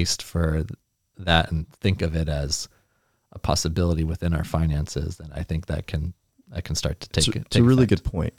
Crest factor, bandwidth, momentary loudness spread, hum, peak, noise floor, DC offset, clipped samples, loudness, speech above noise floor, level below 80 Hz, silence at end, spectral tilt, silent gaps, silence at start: 22 dB; 16 kHz; 13 LU; none; -2 dBFS; -68 dBFS; under 0.1%; under 0.1%; -24 LUFS; 45 dB; -36 dBFS; 0.1 s; -5 dB/octave; none; 0 s